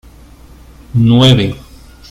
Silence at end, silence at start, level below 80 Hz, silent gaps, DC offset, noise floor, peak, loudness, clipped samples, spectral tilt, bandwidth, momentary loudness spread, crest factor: 0.5 s; 0.95 s; -36 dBFS; none; under 0.1%; -38 dBFS; 0 dBFS; -10 LUFS; under 0.1%; -6.5 dB/octave; 11.5 kHz; 13 LU; 14 dB